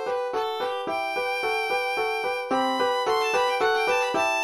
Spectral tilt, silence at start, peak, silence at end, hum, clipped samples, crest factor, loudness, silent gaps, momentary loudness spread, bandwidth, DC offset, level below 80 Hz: -2 dB/octave; 0 s; -12 dBFS; 0 s; none; under 0.1%; 14 dB; -25 LUFS; none; 5 LU; 13 kHz; under 0.1%; -66 dBFS